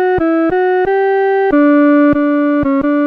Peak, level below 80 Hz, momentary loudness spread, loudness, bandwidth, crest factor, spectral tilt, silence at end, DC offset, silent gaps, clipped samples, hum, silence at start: -2 dBFS; -40 dBFS; 4 LU; -12 LUFS; 4.6 kHz; 8 dB; -8.5 dB/octave; 0 s; under 0.1%; none; under 0.1%; none; 0 s